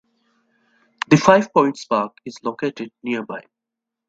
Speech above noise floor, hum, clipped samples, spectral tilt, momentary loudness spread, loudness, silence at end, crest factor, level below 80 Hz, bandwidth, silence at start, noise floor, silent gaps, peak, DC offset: 66 dB; none; under 0.1%; -6 dB/octave; 18 LU; -19 LUFS; 0.7 s; 20 dB; -60 dBFS; 8 kHz; 1.1 s; -84 dBFS; none; 0 dBFS; under 0.1%